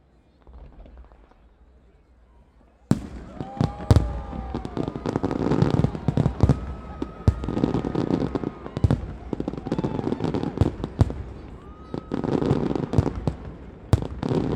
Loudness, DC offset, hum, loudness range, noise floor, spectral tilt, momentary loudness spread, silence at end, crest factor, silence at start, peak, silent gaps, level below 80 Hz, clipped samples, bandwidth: -26 LUFS; under 0.1%; none; 4 LU; -55 dBFS; -8.5 dB/octave; 15 LU; 0 s; 26 dB; 0.45 s; 0 dBFS; none; -36 dBFS; under 0.1%; 11.5 kHz